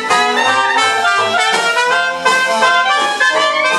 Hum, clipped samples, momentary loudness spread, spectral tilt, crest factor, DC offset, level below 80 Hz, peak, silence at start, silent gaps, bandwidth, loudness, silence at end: none; under 0.1%; 2 LU; -0.5 dB/octave; 12 dB; under 0.1%; -64 dBFS; 0 dBFS; 0 s; none; 13 kHz; -12 LUFS; 0 s